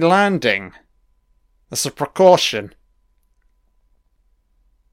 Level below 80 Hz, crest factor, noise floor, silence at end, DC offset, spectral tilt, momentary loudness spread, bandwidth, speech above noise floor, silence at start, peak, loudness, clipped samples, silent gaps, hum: -58 dBFS; 20 dB; -61 dBFS; 2.25 s; under 0.1%; -4 dB/octave; 16 LU; 16 kHz; 45 dB; 0 s; 0 dBFS; -17 LUFS; under 0.1%; none; none